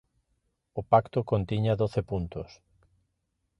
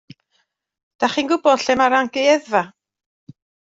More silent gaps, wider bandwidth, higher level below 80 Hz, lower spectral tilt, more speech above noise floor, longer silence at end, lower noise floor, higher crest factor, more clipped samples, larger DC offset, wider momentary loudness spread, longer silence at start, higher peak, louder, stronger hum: neither; second, 6.4 kHz vs 8 kHz; first, -50 dBFS vs -62 dBFS; first, -9 dB/octave vs -3.5 dB/octave; about the same, 51 dB vs 51 dB; first, 1.15 s vs 1 s; first, -78 dBFS vs -68 dBFS; about the same, 22 dB vs 18 dB; neither; neither; first, 16 LU vs 6 LU; second, 0.75 s vs 1 s; second, -8 dBFS vs -2 dBFS; second, -28 LUFS vs -18 LUFS; neither